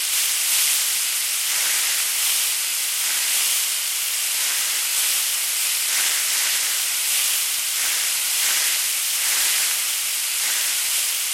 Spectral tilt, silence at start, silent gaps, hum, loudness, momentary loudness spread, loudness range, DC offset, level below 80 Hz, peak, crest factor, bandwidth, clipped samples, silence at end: 5 dB/octave; 0 s; none; none; -18 LUFS; 3 LU; 1 LU; under 0.1%; -76 dBFS; -6 dBFS; 16 dB; 17 kHz; under 0.1%; 0 s